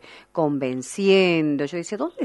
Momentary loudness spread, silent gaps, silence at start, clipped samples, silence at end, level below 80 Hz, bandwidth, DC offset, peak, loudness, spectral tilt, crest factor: 11 LU; none; 0.1 s; under 0.1%; 0 s; -68 dBFS; 11.5 kHz; under 0.1%; -6 dBFS; -22 LUFS; -5.5 dB/octave; 16 dB